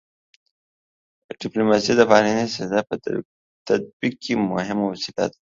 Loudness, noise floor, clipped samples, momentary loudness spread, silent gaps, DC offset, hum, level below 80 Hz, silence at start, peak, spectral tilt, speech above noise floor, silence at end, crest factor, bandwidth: -21 LUFS; under -90 dBFS; under 0.1%; 13 LU; 3.25-3.65 s, 3.93-4.00 s; under 0.1%; none; -60 dBFS; 1.3 s; 0 dBFS; -5 dB/octave; over 69 dB; 0.25 s; 22 dB; 7.6 kHz